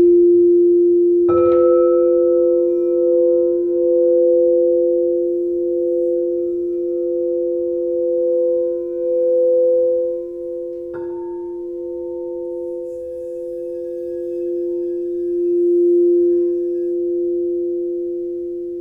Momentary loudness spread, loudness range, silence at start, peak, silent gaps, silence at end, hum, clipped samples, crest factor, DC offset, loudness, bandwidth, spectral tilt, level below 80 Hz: 14 LU; 11 LU; 0 s; -4 dBFS; none; 0 s; none; under 0.1%; 12 dB; under 0.1%; -17 LUFS; 2.5 kHz; -10.5 dB/octave; -56 dBFS